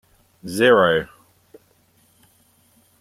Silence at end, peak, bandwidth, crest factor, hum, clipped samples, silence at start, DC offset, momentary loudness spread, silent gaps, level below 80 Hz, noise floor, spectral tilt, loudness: 1.95 s; -2 dBFS; 15.5 kHz; 20 dB; none; under 0.1%; 0.45 s; under 0.1%; 24 LU; none; -58 dBFS; -59 dBFS; -4.5 dB/octave; -17 LUFS